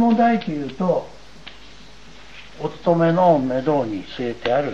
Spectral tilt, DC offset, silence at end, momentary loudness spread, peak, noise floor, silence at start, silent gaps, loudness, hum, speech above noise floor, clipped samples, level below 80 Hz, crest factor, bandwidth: -7.5 dB/octave; 0.9%; 0 s; 25 LU; -4 dBFS; -45 dBFS; 0 s; none; -20 LUFS; none; 25 dB; under 0.1%; -50 dBFS; 18 dB; 7.8 kHz